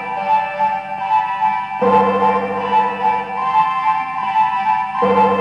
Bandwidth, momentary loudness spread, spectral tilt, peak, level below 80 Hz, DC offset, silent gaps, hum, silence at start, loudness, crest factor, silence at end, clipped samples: 7.2 kHz; 5 LU; -6.5 dB/octave; -2 dBFS; -58 dBFS; under 0.1%; none; 50 Hz at -50 dBFS; 0 s; -17 LUFS; 16 dB; 0 s; under 0.1%